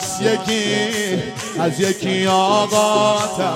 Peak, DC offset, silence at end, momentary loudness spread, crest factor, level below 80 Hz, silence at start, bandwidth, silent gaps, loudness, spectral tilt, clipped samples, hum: -4 dBFS; under 0.1%; 0 s; 6 LU; 14 dB; -56 dBFS; 0 s; 16.5 kHz; none; -18 LUFS; -3.5 dB/octave; under 0.1%; none